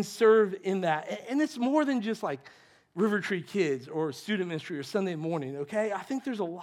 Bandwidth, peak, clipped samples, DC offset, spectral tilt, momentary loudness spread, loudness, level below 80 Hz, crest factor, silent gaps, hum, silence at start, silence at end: 14.5 kHz; -12 dBFS; under 0.1%; under 0.1%; -6 dB/octave; 10 LU; -29 LUFS; -86 dBFS; 18 dB; none; none; 0 s; 0 s